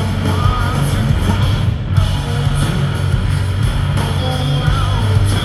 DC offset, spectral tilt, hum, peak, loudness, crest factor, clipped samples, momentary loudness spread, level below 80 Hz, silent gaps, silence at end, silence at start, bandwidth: under 0.1%; -6 dB/octave; none; 0 dBFS; -16 LUFS; 14 dB; under 0.1%; 2 LU; -22 dBFS; none; 0 s; 0 s; 13 kHz